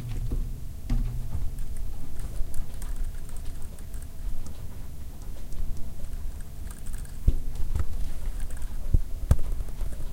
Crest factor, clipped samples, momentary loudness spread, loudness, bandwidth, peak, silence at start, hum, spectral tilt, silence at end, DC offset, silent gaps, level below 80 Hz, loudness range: 20 dB; under 0.1%; 11 LU; -36 LUFS; 16 kHz; -6 dBFS; 0 s; none; -6.5 dB/octave; 0 s; under 0.1%; none; -30 dBFS; 8 LU